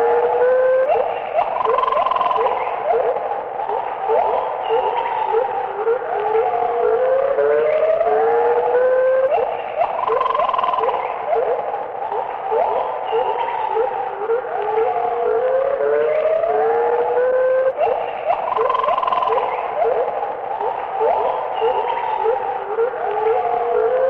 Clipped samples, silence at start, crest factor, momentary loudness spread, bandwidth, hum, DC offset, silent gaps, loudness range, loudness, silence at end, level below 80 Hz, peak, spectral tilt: under 0.1%; 0 s; 12 dB; 6 LU; 5 kHz; none; under 0.1%; none; 3 LU; -19 LUFS; 0 s; -56 dBFS; -6 dBFS; -6 dB/octave